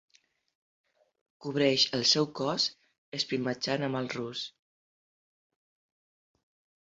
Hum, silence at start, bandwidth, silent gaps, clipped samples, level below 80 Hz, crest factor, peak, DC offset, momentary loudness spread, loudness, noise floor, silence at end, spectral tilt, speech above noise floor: none; 1.4 s; 8 kHz; 2.98-3.12 s; under 0.1%; -74 dBFS; 24 dB; -10 dBFS; under 0.1%; 14 LU; -29 LUFS; under -90 dBFS; 2.35 s; -3.5 dB/octave; over 60 dB